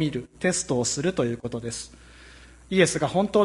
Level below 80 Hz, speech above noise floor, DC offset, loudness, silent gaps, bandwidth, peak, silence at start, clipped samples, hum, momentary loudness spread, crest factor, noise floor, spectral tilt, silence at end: -52 dBFS; 24 dB; under 0.1%; -25 LUFS; none; 11.5 kHz; -6 dBFS; 0 s; under 0.1%; none; 12 LU; 20 dB; -48 dBFS; -4.5 dB/octave; 0 s